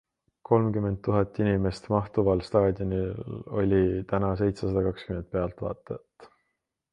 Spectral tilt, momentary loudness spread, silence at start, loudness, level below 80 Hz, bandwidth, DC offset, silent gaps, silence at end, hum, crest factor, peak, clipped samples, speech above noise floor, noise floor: -9 dB/octave; 11 LU; 0.5 s; -27 LUFS; -46 dBFS; 9.6 kHz; under 0.1%; none; 0.65 s; none; 20 dB; -6 dBFS; under 0.1%; 54 dB; -81 dBFS